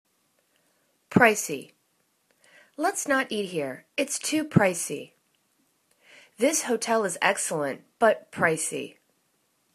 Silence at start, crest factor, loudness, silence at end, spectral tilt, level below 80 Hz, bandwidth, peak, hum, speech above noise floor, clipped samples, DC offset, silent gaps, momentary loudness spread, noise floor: 1.1 s; 24 dB; -25 LUFS; 0.85 s; -4 dB/octave; -68 dBFS; 14 kHz; -2 dBFS; none; 45 dB; under 0.1%; under 0.1%; none; 12 LU; -71 dBFS